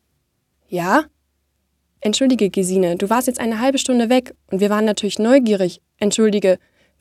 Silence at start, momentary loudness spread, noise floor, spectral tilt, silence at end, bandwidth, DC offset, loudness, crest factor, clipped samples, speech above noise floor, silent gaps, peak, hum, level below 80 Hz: 0.7 s; 9 LU; -69 dBFS; -4.5 dB/octave; 0.45 s; 15 kHz; under 0.1%; -18 LUFS; 18 dB; under 0.1%; 52 dB; none; -2 dBFS; none; -58 dBFS